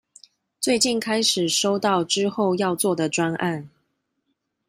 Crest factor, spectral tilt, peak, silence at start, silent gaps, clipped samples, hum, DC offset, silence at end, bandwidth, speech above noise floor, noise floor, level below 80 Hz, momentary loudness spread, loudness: 18 dB; -3.5 dB/octave; -6 dBFS; 0.6 s; none; under 0.1%; none; under 0.1%; 1 s; 15.5 kHz; 53 dB; -75 dBFS; -66 dBFS; 6 LU; -22 LUFS